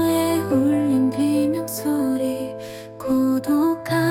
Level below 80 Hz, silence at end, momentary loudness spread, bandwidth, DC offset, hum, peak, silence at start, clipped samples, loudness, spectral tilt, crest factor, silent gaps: -58 dBFS; 0 s; 11 LU; 17.5 kHz; under 0.1%; none; -8 dBFS; 0 s; under 0.1%; -21 LUFS; -6 dB/octave; 12 dB; none